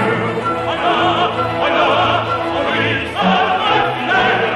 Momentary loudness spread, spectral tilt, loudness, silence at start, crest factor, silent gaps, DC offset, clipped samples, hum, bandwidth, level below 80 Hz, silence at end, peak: 4 LU; -5.5 dB/octave; -15 LUFS; 0 s; 14 dB; none; under 0.1%; under 0.1%; none; 12 kHz; -44 dBFS; 0 s; -2 dBFS